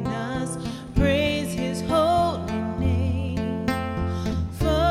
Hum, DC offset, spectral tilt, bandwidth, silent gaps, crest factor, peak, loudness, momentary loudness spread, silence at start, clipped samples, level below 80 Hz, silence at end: none; under 0.1%; -6 dB/octave; 15 kHz; none; 16 dB; -6 dBFS; -25 LUFS; 7 LU; 0 s; under 0.1%; -34 dBFS; 0 s